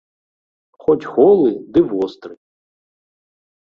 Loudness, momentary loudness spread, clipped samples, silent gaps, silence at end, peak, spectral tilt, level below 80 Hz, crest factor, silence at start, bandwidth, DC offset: -16 LUFS; 11 LU; under 0.1%; none; 1.35 s; -2 dBFS; -9 dB/octave; -56 dBFS; 16 dB; 0.9 s; 5.6 kHz; under 0.1%